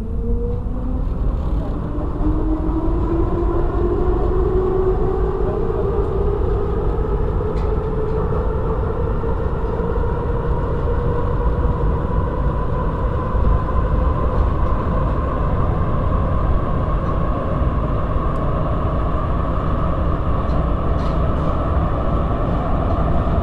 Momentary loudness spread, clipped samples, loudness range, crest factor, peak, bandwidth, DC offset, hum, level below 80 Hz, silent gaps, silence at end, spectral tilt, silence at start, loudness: 3 LU; under 0.1%; 2 LU; 14 dB; -4 dBFS; 4.5 kHz; 0.3%; none; -20 dBFS; none; 0 s; -10 dB/octave; 0 s; -21 LUFS